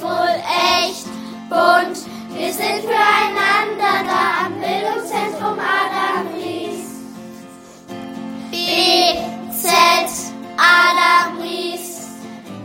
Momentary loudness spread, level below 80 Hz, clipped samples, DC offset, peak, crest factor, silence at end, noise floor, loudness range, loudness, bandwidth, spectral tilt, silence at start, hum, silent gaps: 19 LU; -60 dBFS; under 0.1%; under 0.1%; 0 dBFS; 18 dB; 0 s; -39 dBFS; 8 LU; -16 LUFS; 16.5 kHz; -2 dB/octave; 0 s; none; none